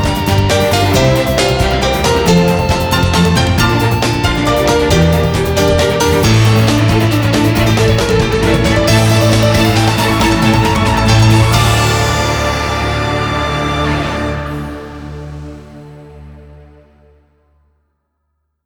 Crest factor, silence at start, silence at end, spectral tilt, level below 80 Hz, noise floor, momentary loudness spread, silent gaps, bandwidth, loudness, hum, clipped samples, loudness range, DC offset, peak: 12 dB; 0 s; 2.1 s; -5 dB/octave; -24 dBFS; -67 dBFS; 6 LU; none; over 20 kHz; -12 LUFS; none; under 0.1%; 9 LU; under 0.1%; 0 dBFS